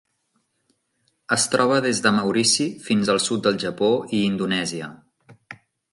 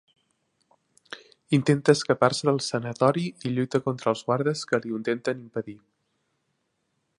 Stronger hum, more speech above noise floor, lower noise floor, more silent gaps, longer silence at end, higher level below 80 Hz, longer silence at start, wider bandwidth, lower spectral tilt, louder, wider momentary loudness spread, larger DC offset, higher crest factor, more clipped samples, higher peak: neither; about the same, 50 dB vs 51 dB; second, -71 dBFS vs -75 dBFS; neither; second, 0.4 s vs 1.4 s; about the same, -64 dBFS vs -68 dBFS; first, 1.3 s vs 1.1 s; about the same, 11.5 kHz vs 11.5 kHz; second, -3.5 dB/octave vs -5.5 dB/octave; first, -21 LUFS vs -25 LUFS; second, 6 LU vs 15 LU; neither; about the same, 20 dB vs 22 dB; neither; about the same, -2 dBFS vs -4 dBFS